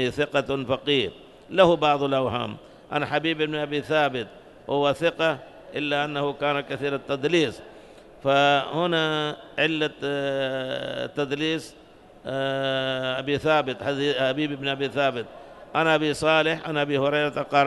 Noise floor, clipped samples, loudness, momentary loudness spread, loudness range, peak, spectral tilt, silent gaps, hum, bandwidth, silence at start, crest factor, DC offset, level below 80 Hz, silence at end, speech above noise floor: -47 dBFS; under 0.1%; -24 LUFS; 10 LU; 3 LU; -4 dBFS; -5 dB/octave; none; none; 12 kHz; 0 s; 20 dB; under 0.1%; -58 dBFS; 0 s; 23 dB